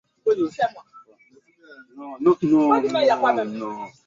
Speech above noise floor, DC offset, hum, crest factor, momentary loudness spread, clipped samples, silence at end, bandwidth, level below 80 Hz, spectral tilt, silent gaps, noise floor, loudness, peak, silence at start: 36 dB; under 0.1%; none; 18 dB; 14 LU; under 0.1%; 0.15 s; 7.6 kHz; -66 dBFS; -6.5 dB/octave; none; -57 dBFS; -21 LUFS; -4 dBFS; 0.25 s